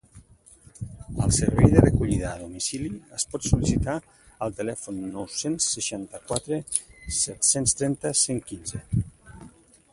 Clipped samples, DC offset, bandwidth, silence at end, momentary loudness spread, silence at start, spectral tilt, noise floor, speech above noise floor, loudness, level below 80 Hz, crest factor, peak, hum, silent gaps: under 0.1%; under 0.1%; 11.5 kHz; 0.45 s; 14 LU; 0.15 s; -4.5 dB/octave; -53 dBFS; 28 dB; -25 LUFS; -38 dBFS; 24 dB; -2 dBFS; none; none